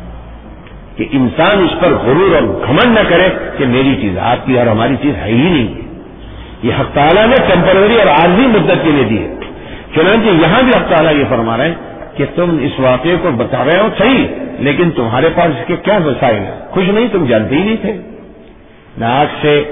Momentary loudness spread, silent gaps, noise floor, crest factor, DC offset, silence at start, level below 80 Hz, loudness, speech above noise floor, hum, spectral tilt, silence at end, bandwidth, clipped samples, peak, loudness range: 12 LU; none; -38 dBFS; 12 dB; under 0.1%; 0 s; -34 dBFS; -11 LUFS; 27 dB; none; -10 dB/octave; 0 s; 3.9 kHz; under 0.1%; 0 dBFS; 4 LU